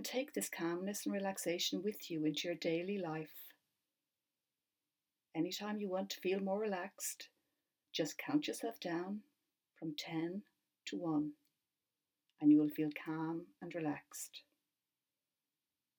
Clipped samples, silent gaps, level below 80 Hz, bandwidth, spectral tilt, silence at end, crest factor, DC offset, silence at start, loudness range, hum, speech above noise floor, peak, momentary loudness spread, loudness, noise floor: under 0.1%; none; under -90 dBFS; 18 kHz; -4.5 dB/octave; 1.6 s; 20 dB; under 0.1%; 0 s; 7 LU; none; over 51 dB; -20 dBFS; 11 LU; -40 LUFS; under -90 dBFS